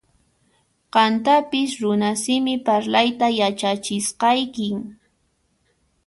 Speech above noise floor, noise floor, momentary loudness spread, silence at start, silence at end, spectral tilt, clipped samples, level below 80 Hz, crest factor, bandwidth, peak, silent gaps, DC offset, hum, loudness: 47 dB; -67 dBFS; 7 LU; 0.95 s; 1.1 s; -3.5 dB/octave; under 0.1%; -64 dBFS; 18 dB; 11.5 kHz; -4 dBFS; none; under 0.1%; none; -20 LUFS